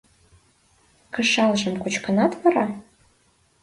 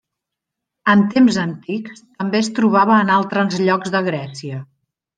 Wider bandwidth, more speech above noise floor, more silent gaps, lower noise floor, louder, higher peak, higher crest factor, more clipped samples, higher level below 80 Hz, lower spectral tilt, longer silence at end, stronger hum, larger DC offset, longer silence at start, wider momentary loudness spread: first, 11.5 kHz vs 9.2 kHz; second, 41 dB vs 65 dB; neither; second, -62 dBFS vs -82 dBFS; second, -22 LUFS vs -17 LUFS; second, -6 dBFS vs -2 dBFS; about the same, 18 dB vs 16 dB; neither; about the same, -62 dBFS vs -62 dBFS; second, -4.5 dB/octave vs -6 dB/octave; first, 0.8 s vs 0.55 s; neither; neither; first, 1.15 s vs 0.85 s; second, 10 LU vs 15 LU